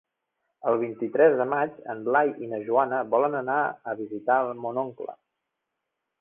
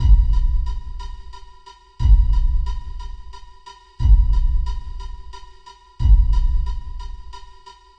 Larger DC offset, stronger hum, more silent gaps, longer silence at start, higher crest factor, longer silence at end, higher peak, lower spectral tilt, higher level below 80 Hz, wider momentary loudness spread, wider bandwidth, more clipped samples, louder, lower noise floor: neither; neither; neither; first, 0.65 s vs 0 s; about the same, 18 dB vs 16 dB; first, 1.05 s vs 0.45 s; second, -8 dBFS vs -2 dBFS; first, -10 dB/octave vs -7 dB/octave; second, -72 dBFS vs -18 dBFS; second, 12 LU vs 24 LU; second, 3.6 kHz vs 6 kHz; neither; second, -26 LUFS vs -21 LUFS; first, -83 dBFS vs -44 dBFS